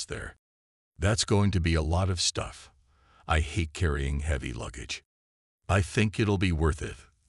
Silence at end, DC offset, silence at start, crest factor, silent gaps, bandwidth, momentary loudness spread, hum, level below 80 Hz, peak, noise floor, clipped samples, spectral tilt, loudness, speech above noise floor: 0.25 s; under 0.1%; 0 s; 18 dB; 0.39-0.92 s, 5.05-5.59 s; 12 kHz; 14 LU; none; -40 dBFS; -10 dBFS; -62 dBFS; under 0.1%; -5 dB/octave; -28 LUFS; 34 dB